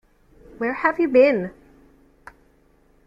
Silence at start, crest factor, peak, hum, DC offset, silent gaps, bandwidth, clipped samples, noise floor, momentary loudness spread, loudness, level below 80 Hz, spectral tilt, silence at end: 0.6 s; 20 dB; -4 dBFS; none; under 0.1%; none; 5.6 kHz; under 0.1%; -58 dBFS; 12 LU; -19 LUFS; -56 dBFS; -7.5 dB/octave; 1.55 s